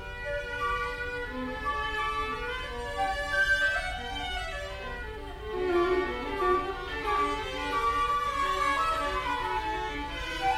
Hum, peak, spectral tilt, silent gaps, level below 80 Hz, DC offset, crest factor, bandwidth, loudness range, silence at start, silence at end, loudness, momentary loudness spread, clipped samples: none; -14 dBFS; -4 dB/octave; none; -42 dBFS; under 0.1%; 16 dB; 16 kHz; 3 LU; 0 s; 0 s; -30 LUFS; 9 LU; under 0.1%